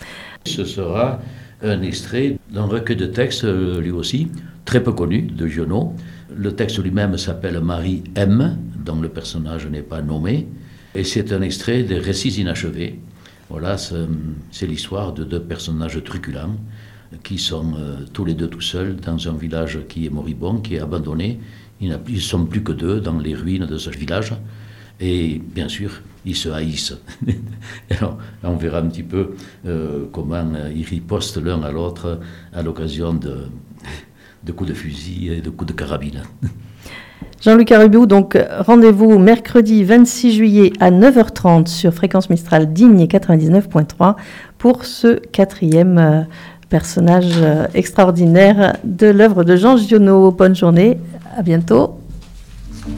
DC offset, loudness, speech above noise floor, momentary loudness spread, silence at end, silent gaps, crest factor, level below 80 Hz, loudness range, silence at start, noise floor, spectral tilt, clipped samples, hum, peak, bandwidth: under 0.1%; -15 LUFS; 22 dB; 19 LU; 0 s; none; 14 dB; -38 dBFS; 15 LU; 0 s; -36 dBFS; -7 dB/octave; 0.2%; none; 0 dBFS; 15.5 kHz